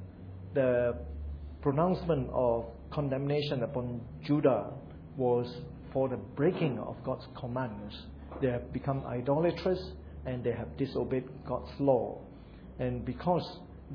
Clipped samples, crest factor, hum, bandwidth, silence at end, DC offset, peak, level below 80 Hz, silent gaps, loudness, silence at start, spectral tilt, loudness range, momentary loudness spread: under 0.1%; 20 dB; none; 5.4 kHz; 0 s; under 0.1%; -14 dBFS; -50 dBFS; none; -33 LUFS; 0 s; -7 dB/octave; 3 LU; 15 LU